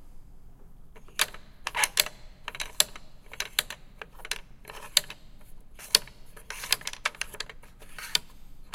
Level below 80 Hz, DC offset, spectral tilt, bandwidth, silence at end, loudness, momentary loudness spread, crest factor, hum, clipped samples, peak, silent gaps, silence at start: -48 dBFS; under 0.1%; 1 dB/octave; 17 kHz; 0 s; -29 LUFS; 22 LU; 32 dB; none; under 0.1%; 0 dBFS; none; 0 s